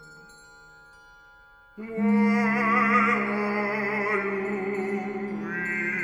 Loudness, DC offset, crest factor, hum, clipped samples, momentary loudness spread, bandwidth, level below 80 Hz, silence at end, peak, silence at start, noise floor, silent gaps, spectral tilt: -25 LUFS; under 0.1%; 18 dB; none; under 0.1%; 11 LU; 10.5 kHz; -62 dBFS; 0 s; -10 dBFS; 0 s; -53 dBFS; none; -7 dB/octave